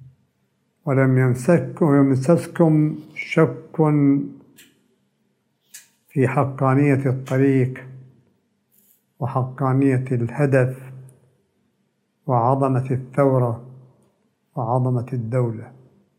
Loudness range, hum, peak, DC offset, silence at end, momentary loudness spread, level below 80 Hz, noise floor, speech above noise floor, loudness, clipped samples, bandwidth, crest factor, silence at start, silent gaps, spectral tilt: 4 LU; none; -4 dBFS; under 0.1%; 0.5 s; 12 LU; -68 dBFS; -69 dBFS; 50 dB; -20 LUFS; under 0.1%; 11.5 kHz; 18 dB; 0.85 s; none; -9 dB/octave